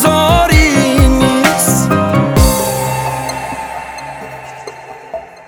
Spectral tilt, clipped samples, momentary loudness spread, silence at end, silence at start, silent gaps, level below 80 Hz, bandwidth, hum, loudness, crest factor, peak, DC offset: -4.5 dB/octave; under 0.1%; 19 LU; 0.05 s; 0 s; none; -20 dBFS; over 20 kHz; none; -11 LUFS; 12 dB; 0 dBFS; under 0.1%